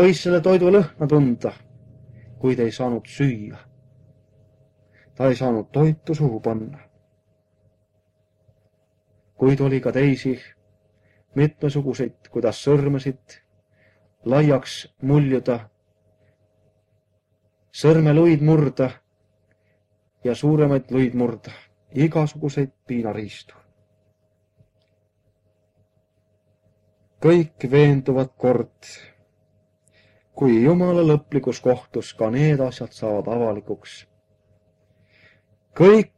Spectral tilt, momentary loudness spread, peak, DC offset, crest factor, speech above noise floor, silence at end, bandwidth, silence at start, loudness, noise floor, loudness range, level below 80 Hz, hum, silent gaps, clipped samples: -8 dB/octave; 15 LU; 0 dBFS; under 0.1%; 22 dB; 48 dB; 0.15 s; 9.6 kHz; 0 s; -20 LUFS; -67 dBFS; 7 LU; -56 dBFS; none; none; under 0.1%